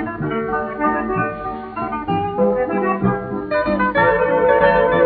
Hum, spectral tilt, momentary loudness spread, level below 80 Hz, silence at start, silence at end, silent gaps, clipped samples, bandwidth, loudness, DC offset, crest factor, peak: none; -5 dB/octave; 10 LU; -42 dBFS; 0 s; 0 s; none; under 0.1%; 4.8 kHz; -18 LUFS; under 0.1%; 16 dB; -2 dBFS